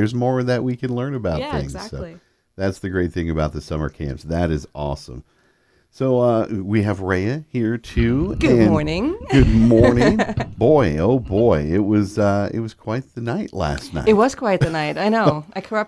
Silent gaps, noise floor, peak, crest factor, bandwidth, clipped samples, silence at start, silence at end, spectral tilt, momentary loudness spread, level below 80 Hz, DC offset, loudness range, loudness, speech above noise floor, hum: none; -60 dBFS; 0 dBFS; 18 dB; 11 kHz; under 0.1%; 0 s; 0 s; -7.5 dB/octave; 12 LU; -34 dBFS; under 0.1%; 9 LU; -19 LUFS; 41 dB; none